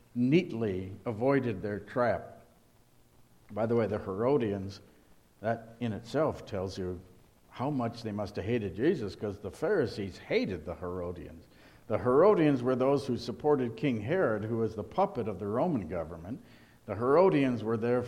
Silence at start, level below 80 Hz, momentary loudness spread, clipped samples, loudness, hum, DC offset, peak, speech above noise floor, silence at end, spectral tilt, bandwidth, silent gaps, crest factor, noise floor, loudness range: 0.15 s; -60 dBFS; 13 LU; under 0.1%; -31 LUFS; none; under 0.1%; -10 dBFS; 32 dB; 0 s; -8 dB/octave; 13 kHz; none; 20 dB; -62 dBFS; 6 LU